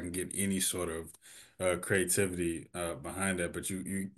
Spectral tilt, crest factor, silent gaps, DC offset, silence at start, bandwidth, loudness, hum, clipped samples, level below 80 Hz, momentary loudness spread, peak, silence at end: -3.5 dB/octave; 20 dB; none; under 0.1%; 0 s; 13 kHz; -33 LUFS; none; under 0.1%; -60 dBFS; 10 LU; -16 dBFS; 0.1 s